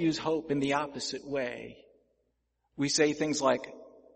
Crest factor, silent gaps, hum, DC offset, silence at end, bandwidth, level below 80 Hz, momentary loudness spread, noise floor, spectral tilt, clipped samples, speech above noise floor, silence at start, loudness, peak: 20 dB; none; none; under 0.1%; 0.25 s; 8.8 kHz; -66 dBFS; 17 LU; -78 dBFS; -4 dB/octave; under 0.1%; 48 dB; 0 s; -30 LUFS; -12 dBFS